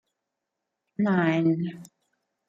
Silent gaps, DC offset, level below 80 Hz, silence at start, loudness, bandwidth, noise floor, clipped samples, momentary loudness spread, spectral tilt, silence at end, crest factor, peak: none; under 0.1%; -74 dBFS; 1 s; -25 LUFS; 8.8 kHz; -84 dBFS; under 0.1%; 12 LU; -8 dB/octave; 0.65 s; 18 dB; -10 dBFS